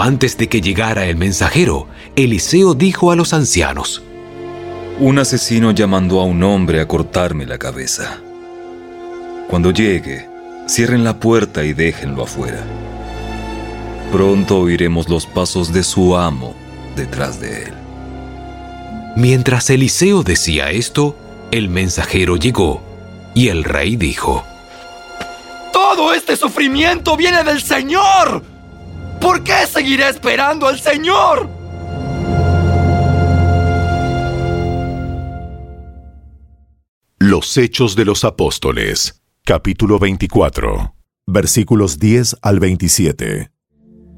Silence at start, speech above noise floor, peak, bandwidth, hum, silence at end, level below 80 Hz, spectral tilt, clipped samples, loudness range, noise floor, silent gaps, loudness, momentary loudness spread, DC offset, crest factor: 0 s; 33 dB; 0 dBFS; 16.5 kHz; none; 0.7 s; -32 dBFS; -5 dB/octave; under 0.1%; 5 LU; -47 dBFS; 36.89-37.01 s; -14 LUFS; 18 LU; under 0.1%; 14 dB